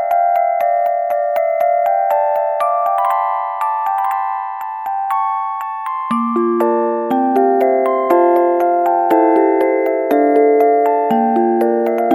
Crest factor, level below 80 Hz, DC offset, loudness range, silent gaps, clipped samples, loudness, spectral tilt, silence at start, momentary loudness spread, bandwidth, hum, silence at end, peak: 14 dB; -70 dBFS; under 0.1%; 5 LU; none; under 0.1%; -15 LUFS; -6.5 dB/octave; 0 s; 7 LU; 18 kHz; none; 0 s; 0 dBFS